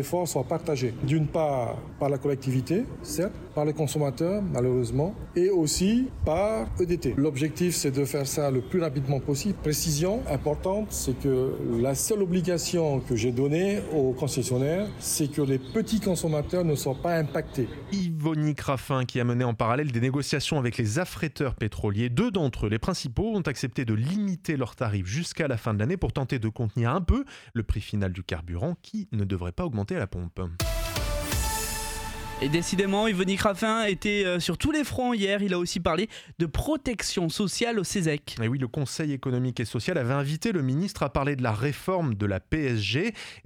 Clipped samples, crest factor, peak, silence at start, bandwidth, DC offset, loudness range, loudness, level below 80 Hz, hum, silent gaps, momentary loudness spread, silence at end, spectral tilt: under 0.1%; 18 dB; -8 dBFS; 0 s; 18 kHz; under 0.1%; 3 LU; -27 LUFS; -42 dBFS; none; none; 5 LU; 0.05 s; -5.5 dB/octave